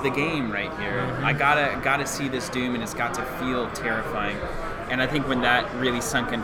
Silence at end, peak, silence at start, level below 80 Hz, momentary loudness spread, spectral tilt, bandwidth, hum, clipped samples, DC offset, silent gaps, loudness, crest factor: 0 s; -6 dBFS; 0 s; -42 dBFS; 7 LU; -4.5 dB/octave; 19 kHz; none; under 0.1%; under 0.1%; none; -25 LUFS; 20 dB